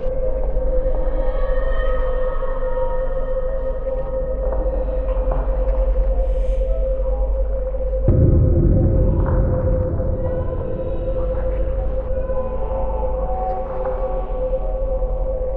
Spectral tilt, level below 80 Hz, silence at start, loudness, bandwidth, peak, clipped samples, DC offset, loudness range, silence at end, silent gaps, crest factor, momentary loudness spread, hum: -11.5 dB/octave; -20 dBFS; 0 s; -22 LUFS; 3.3 kHz; -4 dBFS; under 0.1%; under 0.1%; 5 LU; 0 s; none; 14 dB; 8 LU; none